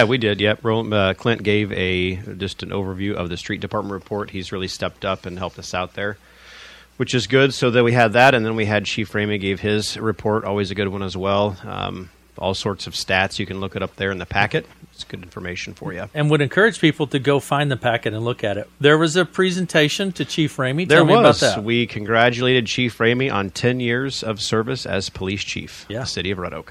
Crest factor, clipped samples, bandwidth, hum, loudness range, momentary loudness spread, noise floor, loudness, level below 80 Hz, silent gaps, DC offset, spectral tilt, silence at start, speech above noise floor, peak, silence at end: 20 dB; under 0.1%; 15 kHz; none; 9 LU; 13 LU; -43 dBFS; -20 LUFS; -50 dBFS; none; under 0.1%; -5 dB/octave; 0 s; 23 dB; 0 dBFS; 0 s